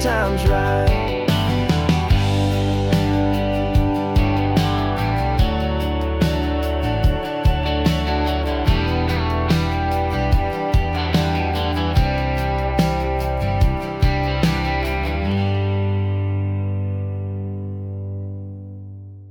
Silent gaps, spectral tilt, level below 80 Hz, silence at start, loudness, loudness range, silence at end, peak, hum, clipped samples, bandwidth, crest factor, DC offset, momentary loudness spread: none; -7 dB/octave; -26 dBFS; 0 s; -20 LUFS; 4 LU; 0 s; -6 dBFS; none; under 0.1%; 18 kHz; 14 dB; under 0.1%; 8 LU